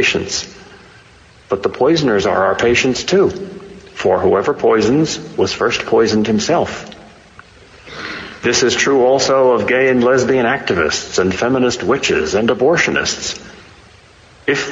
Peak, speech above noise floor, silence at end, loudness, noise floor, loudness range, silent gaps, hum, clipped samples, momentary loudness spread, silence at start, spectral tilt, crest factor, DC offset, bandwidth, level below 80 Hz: -2 dBFS; 30 dB; 0 s; -15 LUFS; -44 dBFS; 3 LU; none; none; under 0.1%; 13 LU; 0 s; -4 dB/octave; 14 dB; under 0.1%; 8 kHz; -46 dBFS